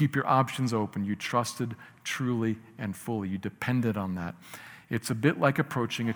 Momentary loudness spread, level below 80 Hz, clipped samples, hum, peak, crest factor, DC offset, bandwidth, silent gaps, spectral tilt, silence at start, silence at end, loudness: 12 LU; -68 dBFS; under 0.1%; none; -10 dBFS; 20 dB; under 0.1%; over 20 kHz; none; -6 dB/octave; 0 s; 0 s; -30 LUFS